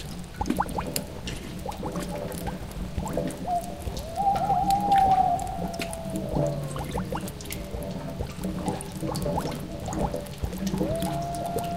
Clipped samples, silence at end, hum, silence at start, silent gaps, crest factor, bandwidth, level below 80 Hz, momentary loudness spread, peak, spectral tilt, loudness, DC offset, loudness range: under 0.1%; 0 s; none; 0 s; none; 22 dB; 16.5 kHz; -40 dBFS; 11 LU; -6 dBFS; -5.5 dB/octave; -29 LUFS; 0.3%; 7 LU